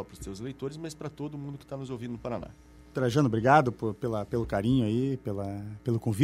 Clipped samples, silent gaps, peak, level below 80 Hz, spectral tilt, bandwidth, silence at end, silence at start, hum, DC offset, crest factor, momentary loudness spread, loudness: under 0.1%; none; -8 dBFS; -52 dBFS; -7 dB/octave; 15 kHz; 0 s; 0 s; none; under 0.1%; 22 dB; 16 LU; -30 LUFS